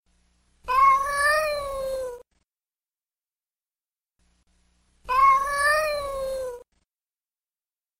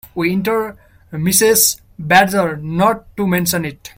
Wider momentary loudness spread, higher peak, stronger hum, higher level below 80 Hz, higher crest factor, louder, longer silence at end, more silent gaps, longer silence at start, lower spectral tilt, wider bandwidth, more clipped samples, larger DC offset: first, 16 LU vs 10 LU; second, -8 dBFS vs 0 dBFS; neither; about the same, -50 dBFS vs -48 dBFS; about the same, 18 dB vs 16 dB; second, -22 LUFS vs -15 LUFS; first, 1.4 s vs 0.1 s; neither; first, 0.65 s vs 0.05 s; second, -1 dB/octave vs -3.5 dB/octave; about the same, 16 kHz vs 17 kHz; neither; neither